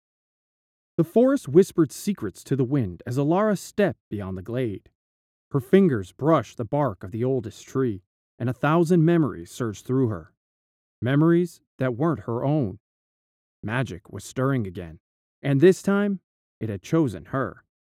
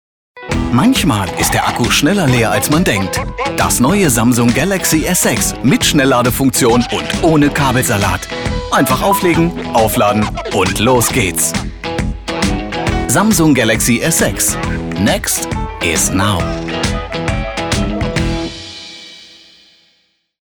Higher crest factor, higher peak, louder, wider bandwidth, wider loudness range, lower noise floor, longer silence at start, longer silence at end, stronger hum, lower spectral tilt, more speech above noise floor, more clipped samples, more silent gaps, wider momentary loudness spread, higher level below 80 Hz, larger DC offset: first, 20 dB vs 12 dB; about the same, -4 dBFS vs -2 dBFS; second, -24 LUFS vs -13 LUFS; second, 15.5 kHz vs over 20 kHz; about the same, 3 LU vs 5 LU; first, under -90 dBFS vs -59 dBFS; first, 1 s vs 0.35 s; second, 0.3 s vs 1.25 s; neither; first, -7.5 dB/octave vs -4 dB/octave; first, over 67 dB vs 47 dB; neither; first, 4.00-4.11 s, 4.95-5.51 s, 8.06-8.38 s, 10.37-11.02 s, 11.67-11.79 s, 12.80-13.63 s, 15.00-15.42 s, 16.23-16.61 s vs none; first, 14 LU vs 8 LU; second, -60 dBFS vs -28 dBFS; neither